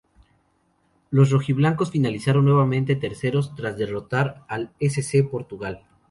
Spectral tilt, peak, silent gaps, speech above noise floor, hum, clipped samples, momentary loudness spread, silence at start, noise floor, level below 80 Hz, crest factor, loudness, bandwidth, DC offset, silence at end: -7 dB/octave; -4 dBFS; none; 44 dB; none; under 0.1%; 13 LU; 1.1 s; -66 dBFS; -56 dBFS; 18 dB; -22 LUFS; 11.5 kHz; under 0.1%; 0.35 s